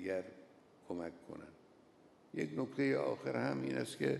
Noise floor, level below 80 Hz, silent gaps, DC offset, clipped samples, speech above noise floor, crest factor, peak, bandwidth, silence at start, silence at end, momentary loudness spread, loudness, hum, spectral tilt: -65 dBFS; -78 dBFS; none; under 0.1%; under 0.1%; 27 dB; 18 dB; -22 dBFS; 12 kHz; 0 s; 0 s; 18 LU; -39 LUFS; none; -6 dB/octave